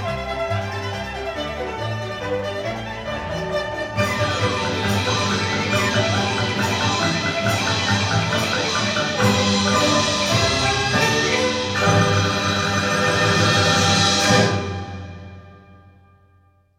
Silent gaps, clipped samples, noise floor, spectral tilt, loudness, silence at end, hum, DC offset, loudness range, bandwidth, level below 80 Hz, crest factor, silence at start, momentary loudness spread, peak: none; under 0.1%; -57 dBFS; -4 dB/octave; -19 LUFS; 1.05 s; none; under 0.1%; 7 LU; 16 kHz; -44 dBFS; 18 dB; 0 s; 11 LU; -2 dBFS